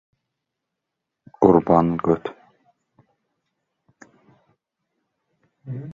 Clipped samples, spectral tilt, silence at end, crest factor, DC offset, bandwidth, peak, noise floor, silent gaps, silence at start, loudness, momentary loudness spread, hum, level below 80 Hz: under 0.1%; -10 dB/octave; 0 s; 24 dB; under 0.1%; 7.2 kHz; -2 dBFS; -82 dBFS; none; 1.4 s; -19 LUFS; 20 LU; none; -54 dBFS